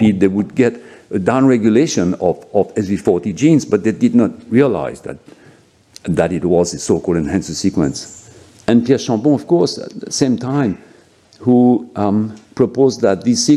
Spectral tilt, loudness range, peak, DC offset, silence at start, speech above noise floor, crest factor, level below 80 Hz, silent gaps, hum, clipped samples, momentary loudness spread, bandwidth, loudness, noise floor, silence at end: -6 dB/octave; 3 LU; 0 dBFS; under 0.1%; 0 s; 33 dB; 14 dB; -48 dBFS; none; none; under 0.1%; 10 LU; 12 kHz; -15 LUFS; -48 dBFS; 0 s